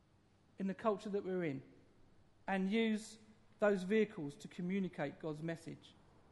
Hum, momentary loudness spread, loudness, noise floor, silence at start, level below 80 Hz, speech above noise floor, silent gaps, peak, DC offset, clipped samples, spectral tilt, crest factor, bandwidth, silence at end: none; 15 LU; -39 LUFS; -70 dBFS; 0.6 s; -74 dBFS; 32 dB; none; -20 dBFS; under 0.1%; under 0.1%; -6.5 dB/octave; 20 dB; 11.5 kHz; 0.45 s